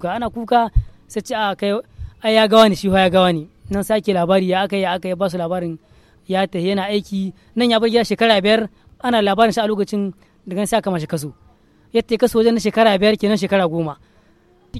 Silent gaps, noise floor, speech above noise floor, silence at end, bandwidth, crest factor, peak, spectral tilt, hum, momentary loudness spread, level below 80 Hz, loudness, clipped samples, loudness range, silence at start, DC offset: none; -53 dBFS; 36 dB; 0 s; 14.5 kHz; 18 dB; 0 dBFS; -5.5 dB/octave; none; 12 LU; -36 dBFS; -18 LUFS; under 0.1%; 4 LU; 0 s; under 0.1%